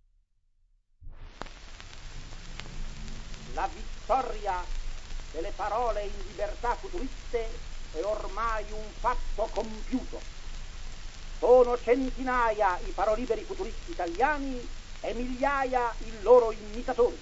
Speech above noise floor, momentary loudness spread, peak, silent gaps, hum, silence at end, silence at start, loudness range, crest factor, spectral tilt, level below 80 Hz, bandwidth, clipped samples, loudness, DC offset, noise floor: 39 dB; 20 LU; -8 dBFS; none; none; 0 s; 1 s; 9 LU; 22 dB; -5 dB/octave; -38 dBFS; 8 kHz; under 0.1%; -29 LUFS; under 0.1%; -67 dBFS